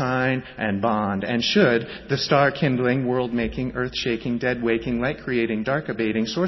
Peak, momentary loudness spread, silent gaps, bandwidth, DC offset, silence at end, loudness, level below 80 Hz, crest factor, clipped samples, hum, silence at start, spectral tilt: -6 dBFS; 7 LU; none; 6.2 kHz; under 0.1%; 0 s; -23 LUFS; -46 dBFS; 18 dB; under 0.1%; none; 0 s; -6 dB/octave